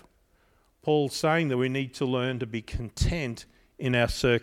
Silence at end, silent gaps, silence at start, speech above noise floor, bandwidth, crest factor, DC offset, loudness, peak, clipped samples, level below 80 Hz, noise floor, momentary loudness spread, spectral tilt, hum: 0 s; none; 0.85 s; 38 dB; 16 kHz; 18 dB; under 0.1%; -28 LUFS; -10 dBFS; under 0.1%; -40 dBFS; -65 dBFS; 11 LU; -5.5 dB/octave; none